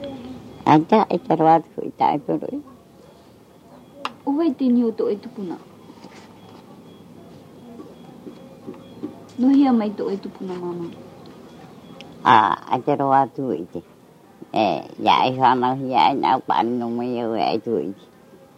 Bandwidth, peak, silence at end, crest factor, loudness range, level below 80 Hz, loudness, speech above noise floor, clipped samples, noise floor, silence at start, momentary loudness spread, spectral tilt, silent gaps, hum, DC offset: 10.5 kHz; 0 dBFS; 0.65 s; 22 dB; 10 LU; -64 dBFS; -20 LUFS; 29 dB; under 0.1%; -49 dBFS; 0 s; 24 LU; -7 dB/octave; none; none; under 0.1%